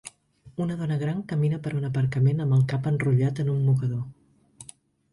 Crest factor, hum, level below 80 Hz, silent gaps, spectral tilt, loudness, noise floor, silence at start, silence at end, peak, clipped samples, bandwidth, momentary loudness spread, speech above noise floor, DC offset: 14 dB; none; -58 dBFS; none; -8 dB/octave; -25 LUFS; -52 dBFS; 0.05 s; 0.5 s; -12 dBFS; under 0.1%; 11.5 kHz; 20 LU; 28 dB; under 0.1%